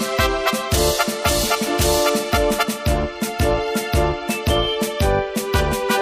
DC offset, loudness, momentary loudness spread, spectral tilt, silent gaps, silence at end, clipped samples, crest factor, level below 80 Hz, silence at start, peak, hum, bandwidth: under 0.1%; -19 LUFS; 4 LU; -4 dB/octave; none; 0 s; under 0.1%; 16 dB; -28 dBFS; 0 s; -2 dBFS; none; 15.5 kHz